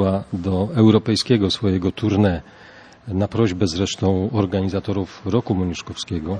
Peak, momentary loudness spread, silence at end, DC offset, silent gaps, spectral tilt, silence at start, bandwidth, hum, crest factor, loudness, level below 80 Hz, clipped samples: -2 dBFS; 10 LU; 0 s; under 0.1%; none; -6.5 dB/octave; 0 s; 10.5 kHz; none; 18 dB; -20 LUFS; -46 dBFS; under 0.1%